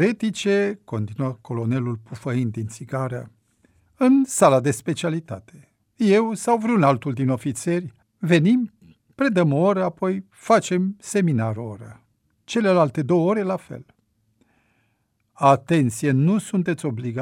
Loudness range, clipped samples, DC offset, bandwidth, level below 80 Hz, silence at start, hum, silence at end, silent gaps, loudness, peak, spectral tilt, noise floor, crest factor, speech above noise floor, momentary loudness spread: 4 LU; under 0.1%; under 0.1%; 16 kHz; -64 dBFS; 0 s; none; 0 s; none; -21 LUFS; -2 dBFS; -6.5 dB/octave; -69 dBFS; 20 dB; 49 dB; 13 LU